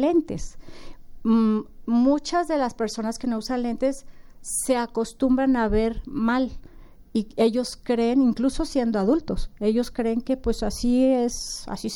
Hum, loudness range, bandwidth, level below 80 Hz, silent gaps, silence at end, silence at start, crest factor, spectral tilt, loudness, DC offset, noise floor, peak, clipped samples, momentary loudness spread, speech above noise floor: none; 2 LU; 17 kHz; -38 dBFS; none; 0 s; 0 s; 16 dB; -5 dB/octave; -24 LUFS; under 0.1%; -45 dBFS; -8 dBFS; under 0.1%; 9 LU; 22 dB